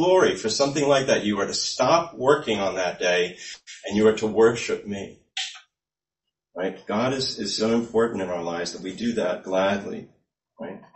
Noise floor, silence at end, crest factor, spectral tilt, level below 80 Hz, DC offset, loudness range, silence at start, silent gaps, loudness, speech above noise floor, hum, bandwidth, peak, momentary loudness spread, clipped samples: under -90 dBFS; 0.15 s; 20 dB; -4 dB/octave; -60 dBFS; under 0.1%; 5 LU; 0 s; none; -23 LUFS; over 67 dB; none; 8.6 kHz; -4 dBFS; 14 LU; under 0.1%